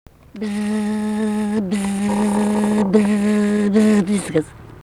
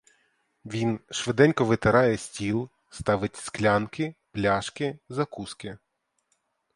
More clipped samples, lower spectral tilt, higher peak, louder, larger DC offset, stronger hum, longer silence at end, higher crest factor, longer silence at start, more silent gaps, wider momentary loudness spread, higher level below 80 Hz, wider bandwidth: neither; about the same, -6.5 dB/octave vs -5.5 dB/octave; about the same, -2 dBFS vs -4 dBFS; first, -18 LUFS vs -26 LUFS; neither; neither; second, 0 s vs 1 s; second, 16 dB vs 22 dB; second, 0.35 s vs 0.65 s; neither; second, 7 LU vs 14 LU; about the same, -48 dBFS vs -52 dBFS; about the same, 12.5 kHz vs 11.5 kHz